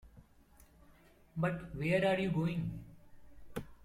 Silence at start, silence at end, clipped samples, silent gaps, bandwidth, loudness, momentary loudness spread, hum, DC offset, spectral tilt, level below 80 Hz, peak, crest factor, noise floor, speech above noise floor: 0.05 s; 0.1 s; under 0.1%; none; 14 kHz; -36 LUFS; 17 LU; none; under 0.1%; -7.5 dB/octave; -58 dBFS; -20 dBFS; 18 dB; -63 dBFS; 29 dB